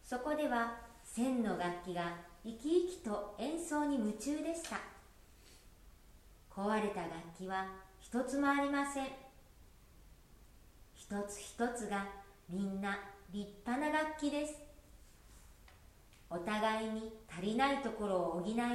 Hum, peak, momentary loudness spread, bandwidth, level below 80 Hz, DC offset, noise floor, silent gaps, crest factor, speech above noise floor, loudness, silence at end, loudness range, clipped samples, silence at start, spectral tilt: none; -20 dBFS; 12 LU; 16 kHz; -62 dBFS; under 0.1%; -61 dBFS; none; 20 dB; 24 dB; -38 LUFS; 0 s; 5 LU; under 0.1%; 0.05 s; -4.5 dB/octave